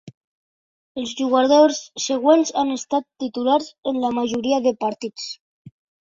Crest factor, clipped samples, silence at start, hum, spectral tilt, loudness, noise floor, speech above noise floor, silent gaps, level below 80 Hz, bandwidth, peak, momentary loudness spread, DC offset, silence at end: 18 dB; under 0.1%; 0.05 s; none; -3.5 dB/octave; -20 LUFS; under -90 dBFS; over 70 dB; 0.14-0.95 s, 3.78-3.83 s, 5.40-5.65 s; -66 dBFS; 7.8 kHz; -4 dBFS; 14 LU; under 0.1%; 0.4 s